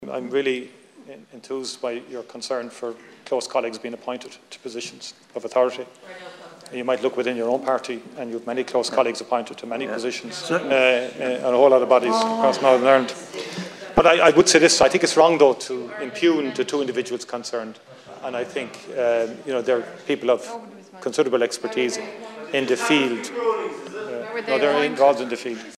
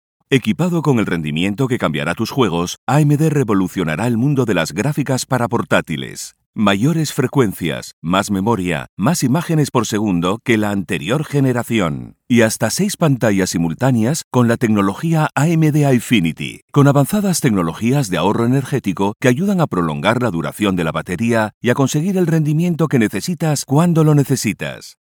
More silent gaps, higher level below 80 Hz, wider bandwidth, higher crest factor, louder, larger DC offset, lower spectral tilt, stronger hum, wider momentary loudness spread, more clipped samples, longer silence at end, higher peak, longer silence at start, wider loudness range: second, none vs 2.78-2.87 s, 6.46-6.53 s, 7.93-8.02 s, 8.89-8.97 s, 14.24-14.31 s, 16.62-16.68 s, 21.54-21.61 s; second, -56 dBFS vs -50 dBFS; second, 13.5 kHz vs 18.5 kHz; about the same, 20 dB vs 16 dB; second, -21 LUFS vs -17 LUFS; neither; second, -3 dB/octave vs -6 dB/octave; neither; first, 18 LU vs 6 LU; neither; second, 0 s vs 0.2 s; about the same, -2 dBFS vs 0 dBFS; second, 0 s vs 0.3 s; first, 12 LU vs 2 LU